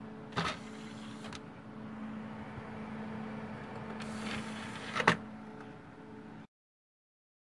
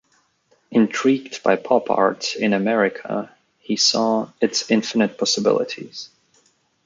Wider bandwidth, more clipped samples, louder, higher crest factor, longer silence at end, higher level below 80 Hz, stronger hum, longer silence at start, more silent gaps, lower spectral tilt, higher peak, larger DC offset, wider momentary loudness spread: first, 11.5 kHz vs 9.4 kHz; neither; second, -39 LUFS vs -20 LUFS; first, 36 dB vs 20 dB; first, 1 s vs 0.8 s; about the same, -66 dBFS vs -68 dBFS; neither; second, 0 s vs 0.7 s; neither; about the same, -4.5 dB/octave vs -3.5 dB/octave; second, -6 dBFS vs -2 dBFS; neither; first, 18 LU vs 11 LU